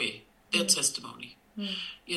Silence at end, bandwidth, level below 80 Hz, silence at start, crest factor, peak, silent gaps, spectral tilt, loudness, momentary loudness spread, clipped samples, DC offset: 0 s; 14 kHz; -72 dBFS; 0 s; 22 dB; -10 dBFS; none; -1 dB/octave; -28 LUFS; 20 LU; under 0.1%; under 0.1%